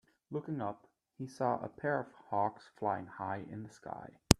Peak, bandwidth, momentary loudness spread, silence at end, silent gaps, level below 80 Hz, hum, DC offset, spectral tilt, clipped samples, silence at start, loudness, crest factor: 0 dBFS; 14.5 kHz; 12 LU; 0.05 s; none; -54 dBFS; none; under 0.1%; -4.5 dB/octave; under 0.1%; 0.3 s; -39 LUFS; 36 dB